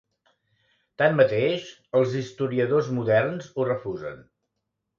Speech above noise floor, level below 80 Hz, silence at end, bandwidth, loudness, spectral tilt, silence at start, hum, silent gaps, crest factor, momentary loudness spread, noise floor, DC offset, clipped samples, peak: 57 dB; -66 dBFS; 0.8 s; 7.4 kHz; -24 LUFS; -7 dB/octave; 1 s; none; none; 20 dB; 11 LU; -81 dBFS; under 0.1%; under 0.1%; -4 dBFS